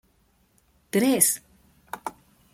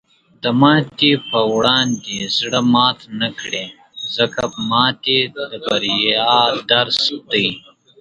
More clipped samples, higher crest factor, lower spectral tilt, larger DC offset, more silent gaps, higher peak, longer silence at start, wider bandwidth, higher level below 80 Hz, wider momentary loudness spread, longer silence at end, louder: neither; first, 24 dB vs 18 dB; about the same, -3 dB/octave vs -4 dB/octave; neither; neither; second, -4 dBFS vs 0 dBFS; first, 0.95 s vs 0.45 s; first, 16.5 kHz vs 9.8 kHz; second, -66 dBFS vs -56 dBFS; first, 19 LU vs 11 LU; about the same, 0.45 s vs 0.4 s; second, -22 LUFS vs -16 LUFS